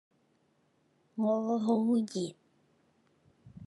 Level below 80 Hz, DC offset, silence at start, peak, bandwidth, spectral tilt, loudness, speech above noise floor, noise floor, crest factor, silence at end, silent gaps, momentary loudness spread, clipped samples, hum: -80 dBFS; under 0.1%; 1.15 s; -16 dBFS; 11.5 kHz; -7 dB/octave; -31 LUFS; 42 dB; -72 dBFS; 18 dB; 0 s; none; 11 LU; under 0.1%; none